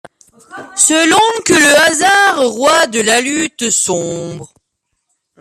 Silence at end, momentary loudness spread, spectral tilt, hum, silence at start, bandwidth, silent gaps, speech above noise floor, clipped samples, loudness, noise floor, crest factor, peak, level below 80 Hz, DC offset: 0.95 s; 14 LU; -1.5 dB/octave; none; 0.5 s; 15 kHz; none; 58 dB; under 0.1%; -10 LUFS; -70 dBFS; 14 dB; 0 dBFS; -54 dBFS; under 0.1%